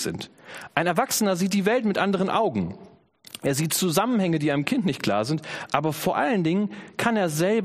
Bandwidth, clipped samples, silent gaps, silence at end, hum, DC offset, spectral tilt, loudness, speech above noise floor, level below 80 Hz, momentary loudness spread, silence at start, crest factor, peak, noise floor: 15.5 kHz; under 0.1%; none; 0 s; none; under 0.1%; -5 dB/octave; -24 LUFS; 22 dB; -62 dBFS; 8 LU; 0 s; 22 dB; -4 dBFS; -46 dBFS